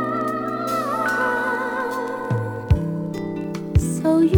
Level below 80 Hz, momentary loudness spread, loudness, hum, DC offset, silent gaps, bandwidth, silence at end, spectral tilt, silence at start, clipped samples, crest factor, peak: -34 dBFS; 7 LU; -23 LUFS; none; under 0.1%; none; 19.5 kHz; 0 s; -7 dB/octave; 0 s; under 0.1%; 18 dB; -2 dBFS